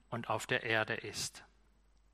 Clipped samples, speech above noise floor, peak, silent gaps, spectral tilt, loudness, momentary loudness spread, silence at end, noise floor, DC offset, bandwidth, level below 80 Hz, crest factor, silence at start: under 0.1%; 31 dB; -16 dBFS; none; -3 dB/octave; -36 LUFS; 9 LU; 0.7 s; -68 dBFS; under 0.1%; 15 kHz; -68 dBFS; 22 dB; 0.1 s